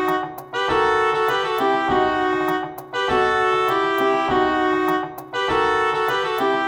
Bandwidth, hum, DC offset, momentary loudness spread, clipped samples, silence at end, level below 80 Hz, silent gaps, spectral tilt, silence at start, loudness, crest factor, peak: 18 kHz; none; under 0.1%; 7 LU; under 0.1%; 0 s; -50 dBFS; none; -4.5 dB/octave; 0 s; -20 LUFS; 14 dB; -6 dBFS